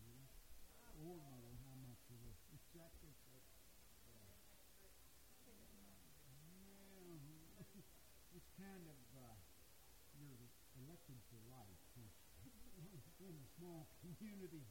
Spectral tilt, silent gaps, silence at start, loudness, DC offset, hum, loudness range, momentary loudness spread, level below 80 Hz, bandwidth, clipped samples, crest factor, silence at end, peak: -5 dB/octave; none; 0 s; -63 LUFS; under 0.1%; none; 4 LU; 9 LU; -72 dBFS; 16.5 kHz; under 0.1%; 16 dB; 0 s; -44 dBFS